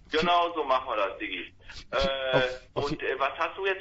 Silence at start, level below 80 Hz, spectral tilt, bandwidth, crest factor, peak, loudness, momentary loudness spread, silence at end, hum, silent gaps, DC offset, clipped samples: 0.1 s; -50 dBFS; -5 dB/octave; 8 kHz; 18 dB; -10 dBFS; -28 LUFS; 10 LU; 0 s; none; none; under 0.1%; under 0.1%